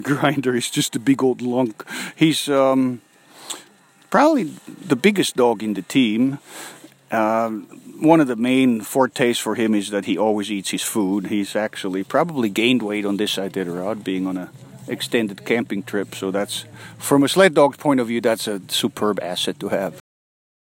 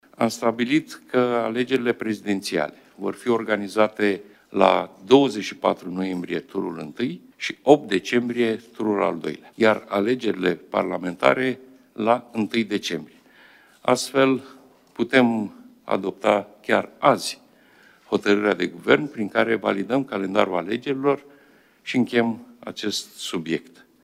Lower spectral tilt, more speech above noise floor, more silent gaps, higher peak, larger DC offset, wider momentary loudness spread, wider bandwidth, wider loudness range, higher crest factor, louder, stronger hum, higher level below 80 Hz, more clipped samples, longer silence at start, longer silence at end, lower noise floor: about the same, -4.5 dB/octave vs -5 dB/octave; about the same, 32 dB vs 33 dB; neither; about the same, -2 dBFS vs 0 dBFS; neither; about the same, 13 LU vs 11 LU; about the same, 16.5 kHz vs 15.5 kHz; about the same, 4 LU vs 3 LU; about the same, 20 dB vs 24 dB; first, -20 LUFS vs -23 LUFS; neither; about the same, -70 dBFS vs -68 dBFS; neither; second, 0 s vs 0.2 s; first, 0.8 s vs 0.45 s; about the same, -52 dBFS vs -55 dBFS